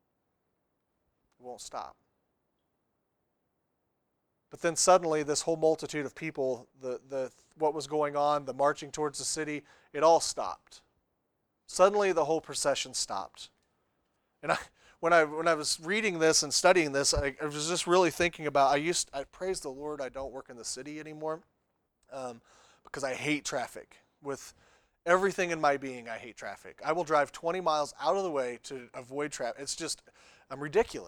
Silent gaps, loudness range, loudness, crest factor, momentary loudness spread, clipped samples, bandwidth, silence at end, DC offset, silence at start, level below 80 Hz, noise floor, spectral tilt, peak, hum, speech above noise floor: none; 12 LU; -30 LUFS; 24 dB; 17 LU; under 0.1%; 19.5 kHz; 0 s; under 0.1%; 1.45 s; -58 dBFS; -80 dBFS; -3 dB/octave; -8 dBFS; none; 49 dB